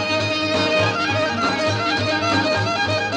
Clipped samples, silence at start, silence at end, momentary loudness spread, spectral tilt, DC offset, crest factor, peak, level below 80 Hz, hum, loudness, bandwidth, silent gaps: under 0.1%; 0 s; 0 s; 2 LU; -4.5 dB/octave; under 0.1%; 12 dB; -6 dBFS; -54 dBFS; none; -19 LUFS; 11 kHz; none